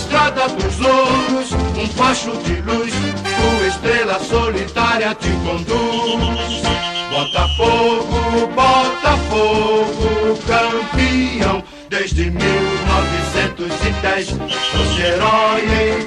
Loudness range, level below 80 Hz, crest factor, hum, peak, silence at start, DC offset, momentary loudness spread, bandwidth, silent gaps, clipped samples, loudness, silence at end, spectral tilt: 2 LU; -26 dBFS; 14 dB; none; -2 dBFS; 0 s; under 0.1%; 6 LU; 11.5 kHz; none; under 0.1%; -16 LUFS; 0 s; -4.5 dB/octave